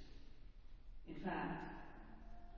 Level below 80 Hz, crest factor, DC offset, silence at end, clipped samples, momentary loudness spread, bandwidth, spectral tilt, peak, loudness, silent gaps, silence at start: -58 dBFS; 18 dB; under 0.1%; 0 s; under 0.1%; 20 LU; 6.8 kHz; -5 dB/octave; -32 dBFS; -48 LUFS; none; 0 s